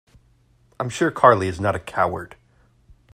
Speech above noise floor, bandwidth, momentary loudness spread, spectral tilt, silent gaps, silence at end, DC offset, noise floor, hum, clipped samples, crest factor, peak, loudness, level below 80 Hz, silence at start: 39 dB; 15 kHz; 16 LU; -6 dB/octave; none; 0.9 s; under 0.1%; -58 dBFS; none; under 0.1%; 22 dB; 0 dBFS; -20 LUFS; -54 dBFS; 0.8 s